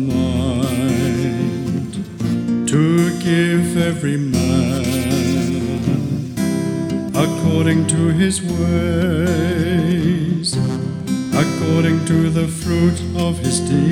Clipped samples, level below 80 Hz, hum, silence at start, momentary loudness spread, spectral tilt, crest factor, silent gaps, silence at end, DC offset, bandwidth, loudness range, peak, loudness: under 0.1%; -44 dBFS; none; 0 s; 5 LU; -6 dB/octave; 12 dB; none; 0 s; under 0.1%; 17 kHz; 2 LU; -4 dBFS; -18 LUFS